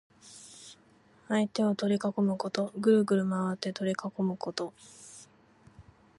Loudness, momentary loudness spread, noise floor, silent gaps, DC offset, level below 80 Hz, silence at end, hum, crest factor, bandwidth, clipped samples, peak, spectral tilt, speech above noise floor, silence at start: -30 LUFS; 24 LU; -62 dBFS; none; under 0.1%; -72 dBFS; 0.4 s; none; 20 dB; 11.5 kHz; under 0.1%; -12 dBFS; -6 dB/octave; 32 dB; 0.25 s